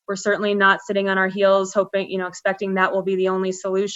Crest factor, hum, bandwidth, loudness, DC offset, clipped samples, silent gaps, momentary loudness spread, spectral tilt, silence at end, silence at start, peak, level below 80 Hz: 18 dB; none; 8 kHz; -20 LUFS; under 0.1%; under 0.1%; none; 7 LU; -4.5 dB/octave; 0 s; 0.1 s; -4 dBFS; -72 dBFS